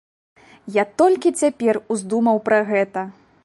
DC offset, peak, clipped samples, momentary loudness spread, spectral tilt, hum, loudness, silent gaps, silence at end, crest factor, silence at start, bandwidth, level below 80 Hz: under 0.1%; -4 dBFS; under 0.1%; 8 LU; -5 dB/octave; none; -19 LUFS; none; 0.35 s; 16 dB; 0.65 s; 11.5 kHz; -68 dBFS